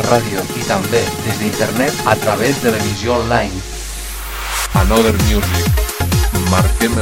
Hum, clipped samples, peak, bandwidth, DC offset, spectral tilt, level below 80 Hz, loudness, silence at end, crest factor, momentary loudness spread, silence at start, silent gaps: none; under 0.1%; 0 dBFS; 17 kHz; under 0.1%; -4.5 dB/octave; -24 dBFS; -16 LUFS; 0 s; 16 dB; 9 LU; 0 s; none